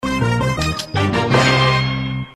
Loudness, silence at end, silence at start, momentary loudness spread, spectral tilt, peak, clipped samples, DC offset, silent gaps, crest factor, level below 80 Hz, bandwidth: -17 LUFS; 0.05 s; 0 s; 7 LU; -5 dB/octave; -2 dBFS; under 0.1%; under 0.1%; none; 16 dB; -34 dBFS; 13 kHz